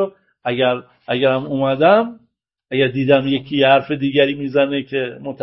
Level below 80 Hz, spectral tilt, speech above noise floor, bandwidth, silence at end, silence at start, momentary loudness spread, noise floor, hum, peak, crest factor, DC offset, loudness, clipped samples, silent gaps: -56 dBFS; -11 dB/octave; 42 dB; 5.8 kHz; 0 s; 0 s; 11 LU; -58 dBFS; none; 0 dBFS; 18 dB; under 0.1%; -17 LUFS; under 0.1%; none